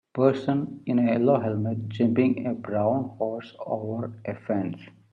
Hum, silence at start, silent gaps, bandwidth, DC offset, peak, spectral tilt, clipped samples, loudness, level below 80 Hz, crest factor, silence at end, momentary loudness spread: none; 0.15 s; none; 7 kHz; under 0.1%; -6 dBFS; -9.5 dB/octave; under 0.1%; -26 LUFS; -70 dBFS; 18 dB; 0.25 s; 11 LU